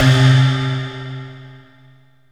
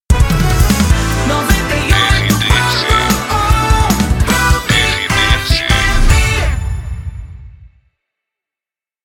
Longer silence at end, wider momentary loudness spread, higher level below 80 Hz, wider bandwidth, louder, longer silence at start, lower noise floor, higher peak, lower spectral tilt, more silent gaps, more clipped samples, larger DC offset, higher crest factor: second, 0.75 s vs 1.4 s; first, 20 LU vs 6 LU; second, -44 dBFS vs -16 dBFS; second, 9.8 kHz vs 18 kHz; second, -15 LUFS vs -12 LUFS; about the same, 0 s vs 0.1 s; second, -50 dBFS vs -89 dBFS; about the same, -2 dBFS vs 0 dBFS; first, -6 dB/octave vs -4 dB/octave; neither; neither; first, 0.2% vs under 0.1%; about the same, 16 dB vs 12 dB